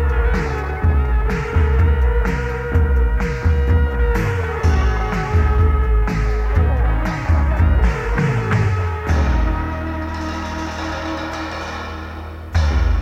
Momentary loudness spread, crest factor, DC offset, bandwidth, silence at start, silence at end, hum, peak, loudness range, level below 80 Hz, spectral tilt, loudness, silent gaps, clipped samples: 8 LU; 12 dB; under 0.1%; 7.8 kHz; 0 s; 0 s; none; -4 dBFS; 5 LU; -18 dBFS; -7 dB/octave; -19 LUFS; none; under 0.1%